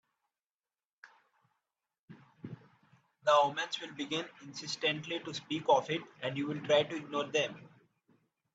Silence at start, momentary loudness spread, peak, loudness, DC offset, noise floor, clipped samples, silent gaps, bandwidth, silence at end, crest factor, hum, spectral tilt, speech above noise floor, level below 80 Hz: 1.05 s; 21 LU; -14 dBFS; -33 LUFS; under 0.1%; under -90 dBFS; under 0.1%; 1.99-2.08 s; 8 kHz; 0.9 s; 22 dB; none; -4 dB/octave; over 57 dB; -80 dBFS